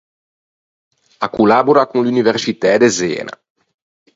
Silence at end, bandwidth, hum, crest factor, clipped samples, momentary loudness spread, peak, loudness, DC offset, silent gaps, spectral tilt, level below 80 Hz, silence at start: 0.85 s; 8 kHz; none; 16 dB; under 0.1%; 12 LU; 0 dBFS; -14 LUFS; under 0.1%; none; -4.5 dB/octave; -56 dBFS; 1.2 s